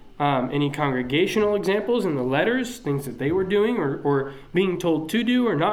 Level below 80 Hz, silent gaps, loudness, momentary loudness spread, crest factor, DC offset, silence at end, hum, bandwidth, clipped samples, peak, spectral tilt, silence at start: -50 dBFS; none; -23 LUFS; 5 LU; 14 dB; under 0.1%; 0 s; none; 16.5 kHz; under 0.1%; -8 dBFS; -6 dB/octave; 0.05 s